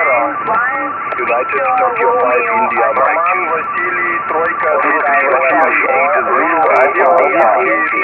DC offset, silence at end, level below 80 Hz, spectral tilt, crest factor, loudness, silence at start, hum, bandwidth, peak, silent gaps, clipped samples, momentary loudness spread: under 0.1%; 0 s; -56 dBFS; -7 dB/octave; 12 dB; -12 LUFS; 0 s; none; 5.6 kHz; 0 dBFS; none; under 0.1%; 5 LU